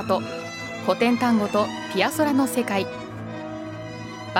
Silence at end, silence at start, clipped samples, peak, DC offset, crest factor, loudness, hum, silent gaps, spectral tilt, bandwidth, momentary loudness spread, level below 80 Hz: 0 s; 0 s; under 0.1%; -4 dBFS; under 0.1%; 20 dB; -24 LUFS; none; none; -5 dB/octave; 16.5 kHz; 14 LU; -60 dBFS